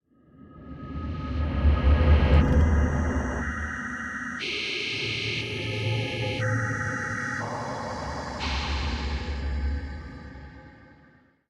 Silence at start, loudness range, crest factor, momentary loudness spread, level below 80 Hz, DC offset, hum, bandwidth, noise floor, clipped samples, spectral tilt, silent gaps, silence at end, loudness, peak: 0.4 s; 8 LU; 18 dB; 17 LU; -30 dBFS; under 0.1%; none; 8.8 kHz; -58 dBFS; under 0.1%; -6 dB/octave; none; 0.7 s; -27 LUFS; -8 dBFS